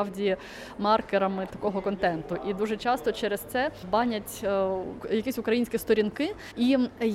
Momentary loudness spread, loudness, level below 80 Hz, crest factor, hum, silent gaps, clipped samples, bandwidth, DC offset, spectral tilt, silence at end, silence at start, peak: 7 LU; -28 LUFS; -54 dBFS; 18 dB; none; none; under 0.1%; 16.5 kHz; under 0.1%; -5.5 dB/octave; 0 s; 0 s; -10 dBFS